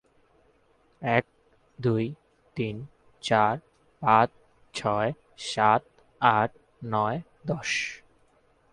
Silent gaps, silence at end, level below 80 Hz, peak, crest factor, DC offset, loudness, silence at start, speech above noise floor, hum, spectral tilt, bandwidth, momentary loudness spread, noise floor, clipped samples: none; 0.75 s; -62 dBFS; -6 dBFS; 24 dB; under 0.1%; -27 LUFS; 1 s; 39 dB; none; -5 dB/octave; 11 kHz; 14 LU; -64 dBFS; under 0.1%